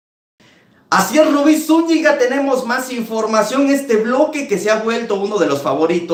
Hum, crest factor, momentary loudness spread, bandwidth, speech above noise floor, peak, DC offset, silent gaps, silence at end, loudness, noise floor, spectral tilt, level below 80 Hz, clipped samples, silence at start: none; 16 dB; 6 LU; 16.5 kHz; 35 dB; 0 dBFS; under 0.1%; none; 0 s; -15 LUFS; -50 dBFS; -4.5 dB/octave; -64 dBFS; under 0.1%; 0.9 s